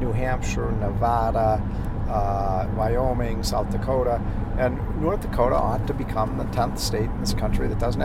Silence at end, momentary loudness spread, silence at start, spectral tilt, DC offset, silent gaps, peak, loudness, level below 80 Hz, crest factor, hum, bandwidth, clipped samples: 0 s; 4 LU; 0 s; -6.5 dB/octave; under 0.1%; none; -8 dBFS; -25 LUFS; -28 dBFS; 16 dB; none; 16 kHz; under 0.1%